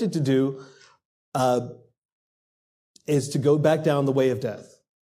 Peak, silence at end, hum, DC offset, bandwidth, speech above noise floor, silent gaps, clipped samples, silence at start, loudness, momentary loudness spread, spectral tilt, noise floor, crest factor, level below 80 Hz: -8 dBFS; 0.45 s; none; under 0.1%; 15.5 kHz; over 67 dB; 1.05-1.32 s, 1.98-2.94 s; under 0.1%; 0 s; -23 LUFS; 19 LU; -6.5 dB/octave; under -90 dBFS; 18 dB; -70 dBFS